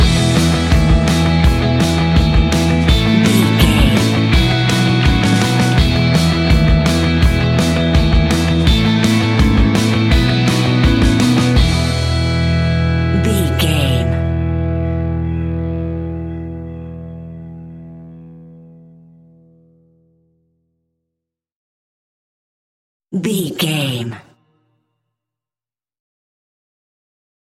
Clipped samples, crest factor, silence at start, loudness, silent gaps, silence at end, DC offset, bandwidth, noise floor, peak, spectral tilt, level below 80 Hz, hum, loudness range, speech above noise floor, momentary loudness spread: under 0.1%; 14 dB; 0 s; -14 LUFS; 21.52-23.00 s; 3.3 s; under 0.1%; 16 kHz; under -90 dBFS; 0 dBFS; -6 dB/octave; -22 dBFS; none; 14 LU; over 71 dB; 12 LU